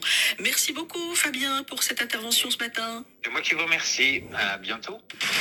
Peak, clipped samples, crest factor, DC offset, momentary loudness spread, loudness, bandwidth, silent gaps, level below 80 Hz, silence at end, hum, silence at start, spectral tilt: -8 dBFS; under 0.1%; 18 dB; under 0.1%; 11 LU; -24 LUFS; 18 kHz; none; -68 dBFS; 0 s; none; 0 s; 0 dB/octave